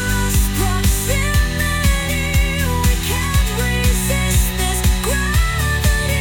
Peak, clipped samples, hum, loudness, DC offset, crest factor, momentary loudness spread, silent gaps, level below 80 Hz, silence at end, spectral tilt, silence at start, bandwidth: -2 dBFS; under 0.1%; none; -17 LUFS; under 0.1%; 14 dB; 1 LU; none; -20 dBFS; 0 s; -4 dB/octave; 0 s; 18 kHz